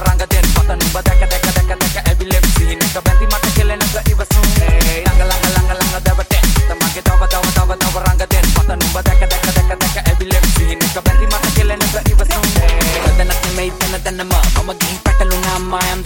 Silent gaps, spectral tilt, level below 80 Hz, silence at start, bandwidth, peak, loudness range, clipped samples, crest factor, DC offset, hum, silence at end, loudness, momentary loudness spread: none; -4 dB/octave; -14 dBFS; 0 s; 17 kHz; 0 dBFS; 1 LU; under 0.1%; 12 dB; 0.2%; none; 0 s; -14 LUFS; 3 LU